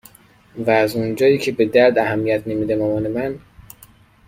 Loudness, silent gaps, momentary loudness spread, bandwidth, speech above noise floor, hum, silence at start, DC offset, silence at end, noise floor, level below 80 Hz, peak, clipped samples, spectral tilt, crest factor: -18 LUFS; none; 11 LU; 16.5 kHz; 31 dB; none; 0.55 s; under 0.1%; 0.65 s; -49 dBFS; -52 dBFS; -2 dBFS; under 0.1%; -6.5 dB/octave; 18 dB